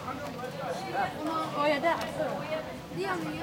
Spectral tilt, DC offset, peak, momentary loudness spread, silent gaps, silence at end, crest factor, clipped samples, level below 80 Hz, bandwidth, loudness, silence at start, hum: -5 dB/octave; under 0.1%; -16 dBFS; 10 LU; none; 0 s; 16 dB; under 0.1%; -60 dBFS; 16.5 kHz; -32 LUFS; 0 s; none